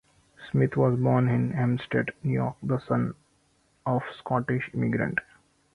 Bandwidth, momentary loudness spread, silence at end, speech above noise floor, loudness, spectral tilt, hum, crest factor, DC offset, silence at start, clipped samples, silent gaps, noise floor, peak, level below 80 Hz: 4.4 kHz; 7 LU; 0.55 s; 41 dB; -27 LUFS; -9.5 dB/octave; none; 18 dB; under 0.1%; 0.4 s; under 0.1%; none; -67 dBFS; -10 dBFS; -58 dBFS